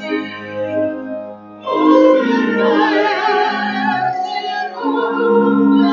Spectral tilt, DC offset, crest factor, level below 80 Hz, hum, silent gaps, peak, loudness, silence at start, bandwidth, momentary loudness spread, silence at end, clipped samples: -6.5 dB/octave; under 0.1%; 14 dB; -66 dBFS; none; none; 0 dBFS; -15 LUFS; 0 s; 7 kHz; 13 LU; 0 s; under 0.1%